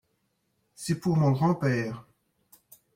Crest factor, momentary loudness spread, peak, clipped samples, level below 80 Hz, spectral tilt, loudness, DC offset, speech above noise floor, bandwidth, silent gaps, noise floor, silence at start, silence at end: 16 dB; 14 LU; -14 dBFS; under 0.1%; -64 dBFS; -7 dB/octave; -27 LUFS; under 0.1%; 49 dB; 16 kHz; none; -75 dBFS; 0.8 s; 0.95 s